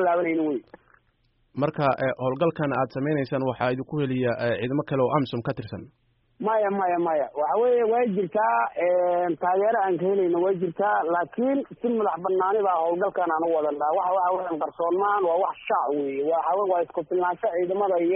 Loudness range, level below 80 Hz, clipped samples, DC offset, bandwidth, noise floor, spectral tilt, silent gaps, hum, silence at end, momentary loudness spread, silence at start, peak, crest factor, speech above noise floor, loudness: 3 LU; -64 dBFS; under 0.1%; under 0.1%; 5.2 kHz; -67 dBFS; -6 dB/octave; none; none; 0 s; 5 LU; 0 s; -10 dBFS; 14 dB; 43 dB; -25 LUFS